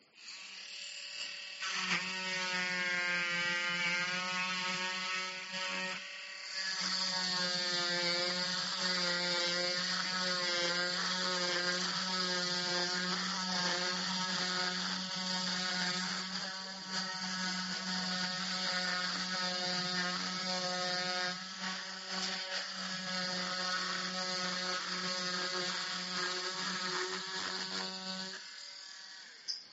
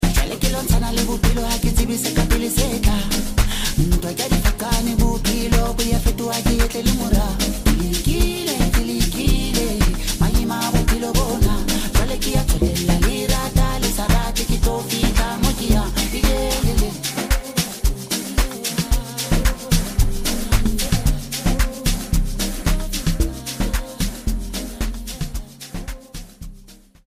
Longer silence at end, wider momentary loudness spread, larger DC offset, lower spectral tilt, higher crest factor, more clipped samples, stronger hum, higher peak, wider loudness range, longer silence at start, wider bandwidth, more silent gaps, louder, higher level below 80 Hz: second, 0 s vs 0.45 s; first, 9 LU vs 6 LU; neither; second, -0.5 dB/octave vs -4.5 dB/octave; about the same, 16 dB vs 16 dB; neither; neither; second, -20 dBFS vs -4 dBFS; about the same, 4 LU vs 4 LU; first, 0.15 s vs 0 s; second, 8 kHz vs 15.5 kHz; neither; second, -34 LUFS vs -21 LUFS; second, -80 dBFS vs -22 dBFS